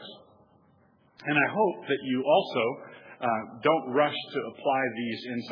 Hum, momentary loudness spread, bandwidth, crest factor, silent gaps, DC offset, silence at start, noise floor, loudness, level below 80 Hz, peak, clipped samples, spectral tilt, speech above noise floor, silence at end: none; 10 LU; 5.4 kHz; 20 dB; none; under 0.1%; 0 s; -63 dBFS; -28 LUFS; -82 dBFS; -8 dBFS; under 0.1%; -7.5 dB/octave; 35 dB; 0 s